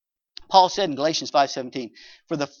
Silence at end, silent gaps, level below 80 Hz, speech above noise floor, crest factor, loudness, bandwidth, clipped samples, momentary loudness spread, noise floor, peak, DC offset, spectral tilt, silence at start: 0.15 s; none; -66 dBFS; 25 dB; 22 dB; -22 LUFS; 7.4 kHz; under 0.1%; 15 LU; -48 dBFS; 0 dBFS; under 0.1%; -3.5 dB/octave; 0.5 s